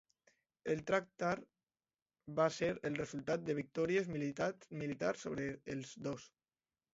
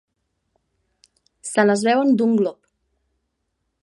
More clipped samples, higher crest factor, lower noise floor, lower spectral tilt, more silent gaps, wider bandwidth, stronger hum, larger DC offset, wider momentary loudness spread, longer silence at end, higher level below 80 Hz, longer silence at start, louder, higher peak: neither; about the same, 22 dB vs 20 dB; first, under -90 dBFS vs -75 dBFS; about the same, -5 dB/octave vs -5 dB/octave; first, 2.02-2.06 s vs none; second, 7.6 kHz vs 11.5 kHz; neither; neither; about the same, 9 LU vs 8 LU; second, 0.65 s vs 1.3 s; about the same, -72 dBFS vs -70 dBFS; second, 0.65 s vs 1.45 s; second, -39 LUFS vs -19 LUFS; second, -18 dBFS vs -2 dBFS